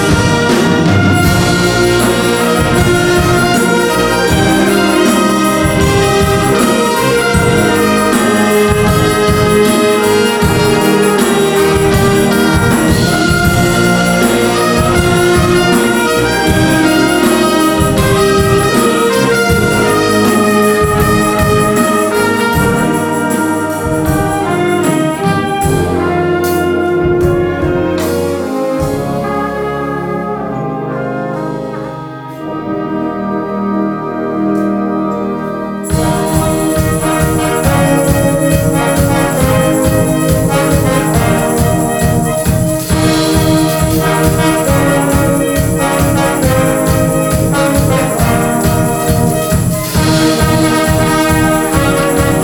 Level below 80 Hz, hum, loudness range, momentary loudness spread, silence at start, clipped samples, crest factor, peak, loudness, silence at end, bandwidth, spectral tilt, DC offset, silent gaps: -26 dBFS; none; 6 LU; 6 LU; 0 s; under 0.1%; 10 dB; 0 dBFS; -11 LUFS; 0 s; over 20 kHz; -5 dB/octave; under 0.1%; none